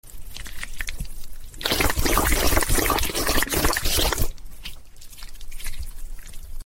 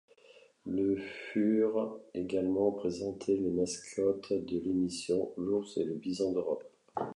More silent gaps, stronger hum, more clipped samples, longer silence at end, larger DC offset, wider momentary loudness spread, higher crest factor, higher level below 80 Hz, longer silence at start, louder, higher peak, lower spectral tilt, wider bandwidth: neither; neither; neither; about the same, 0 s vs 0 s; neither; first, 22 LU vs 8 LU; about the same, 20 dB vs 16 dB; first, -28 dBFS vs -64 dBFS; second, 0.05 s vs 0.65 s; first, -22 LUFS vs -33 LUFS; first, -4 dBFS vs -16 dBFS; second, -2.5 dB/octave vs -6 dB/octave; first, 17 kHz vs 11 kHz